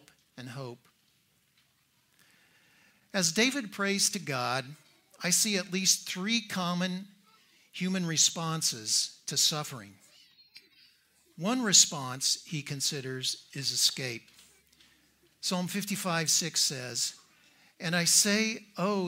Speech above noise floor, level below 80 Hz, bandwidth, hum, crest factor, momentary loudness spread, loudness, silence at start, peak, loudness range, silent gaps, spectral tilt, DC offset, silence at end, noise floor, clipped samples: 40 dB; -78 dBFS; 16 kHz; none; 26 dB; 15 LU; -28 LUFS; 0.35 s; -6 dBFS; 5 LU; none; -2 dB/octave; under 0.1%; 0 s; -70 dBFS; under 0.1%